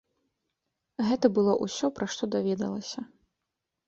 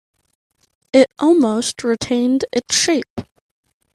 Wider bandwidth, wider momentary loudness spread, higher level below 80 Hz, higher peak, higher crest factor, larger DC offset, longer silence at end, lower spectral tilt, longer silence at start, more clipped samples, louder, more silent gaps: second, 8 kHz vs 13 kHz; first, 16 LU vs 7 LU; second, -68 dBFS vs -56 dBFS; second, -8 dBFS vs 0 dBFS; about the same, 22 dB vs 18 dB; neither; about the same, 0.85 s vs 0.75 s; first, -5.5 dB/octave vs -3 dB/octave; about the same, 1 s vs 0.95 s; neither; second, -28 LUFS vs -16 LUFS; second, none vs 3.10-3.16 s